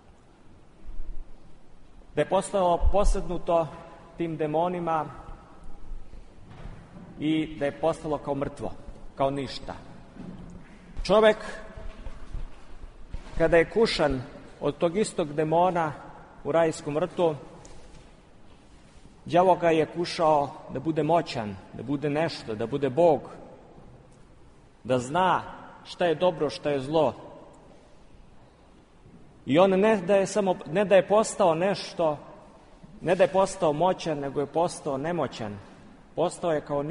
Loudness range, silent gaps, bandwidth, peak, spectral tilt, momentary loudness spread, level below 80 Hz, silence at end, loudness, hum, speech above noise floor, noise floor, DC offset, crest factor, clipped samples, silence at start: 7 LU; none; 10.5 kHz; -6 dBFS; -5.5 dB/octave; 23 LU; -40 dBFS; 0 s; -26 LUFS; none; 29 dB; -54 dBFS; under 0.1%; 20 dB; under 0.1%; 0.8 s